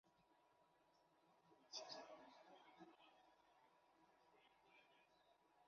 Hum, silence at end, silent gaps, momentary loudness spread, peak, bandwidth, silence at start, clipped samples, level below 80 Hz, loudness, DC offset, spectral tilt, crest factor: none; 0 s; none; 13 LU; -40 dBFS; 6.8 kHz; 0.05 s; under 0.1%; under -90 dBFS; -60 LUFS; under 0.1%; -0.5 dB/octave; 26 dB